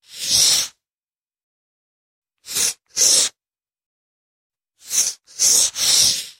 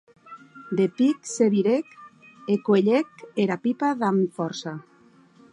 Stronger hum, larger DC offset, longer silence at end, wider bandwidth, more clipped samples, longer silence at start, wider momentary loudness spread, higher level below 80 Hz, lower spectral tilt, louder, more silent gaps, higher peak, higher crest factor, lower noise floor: neither; neither; second, 0.1 s vs 0.7 s; first, 16.5 kHz vs 11 kHz; neither; second, 0.15 s vs 0.3 s; second, 9 LU vs 18 LU; first, -58 dBFS vs -76 dBFS; second, 2 dB/octave vs -6 dB/octave; first, -15 LUFS vs -24 LUFS; first, 1.09-1.31 s, 1.43-2.22 s, 3.86-4.50 s vs none; first, 0 dBFS vs -8 dBFS; about the same, 20 dB vs 16 dB; first, under -90 dBFS vs -55 dBFS